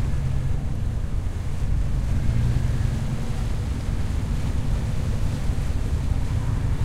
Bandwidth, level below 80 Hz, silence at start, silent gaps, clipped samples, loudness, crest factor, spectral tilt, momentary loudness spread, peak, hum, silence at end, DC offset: 14 kHz; -26 dBFS; 0 s; none; under 0.1%; -27 LUFS; 14 dB; -7 dB/octave; 4 LU; -10 dBFS; none; 0 s; under 0.1%